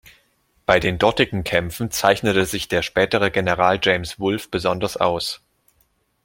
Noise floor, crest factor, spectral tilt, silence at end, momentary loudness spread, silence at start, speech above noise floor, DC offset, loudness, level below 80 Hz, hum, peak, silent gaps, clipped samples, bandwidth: -64 dBFS; 20 dB; -4.5 dB/octave; 0.9 s; 7 LU; 0.7 s; 45 dB; under 0.1%; -20 LUFS; -46 dBFS; none; -2 dBFS; none; under 0.1%; 17 kHz